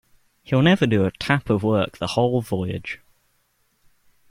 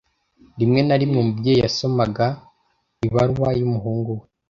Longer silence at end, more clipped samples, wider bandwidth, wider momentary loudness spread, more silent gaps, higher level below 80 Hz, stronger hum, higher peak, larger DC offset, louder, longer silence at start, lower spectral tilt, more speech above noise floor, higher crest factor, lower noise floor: first, 1.35 s vs 0.3 s; neither; first, 16 kHz vs 7.4 kHz; first, 12 LU vs 8 LU; neither; second, -52 dBFS vs -46 dBFS; neither; about the same, -2 dBFS vs -4 dBFS; neither; about the same, -21 LUFS vs -20 LUFS; about the same, 0.5 s vs 0.55 s; about the same, -7 dB/octave vs -7 dB/octave; about the same, 46 dB vs 48 dB; about the same, 20 dB vs 16 dB; about the same, -66 dBFS vs -67 dBFS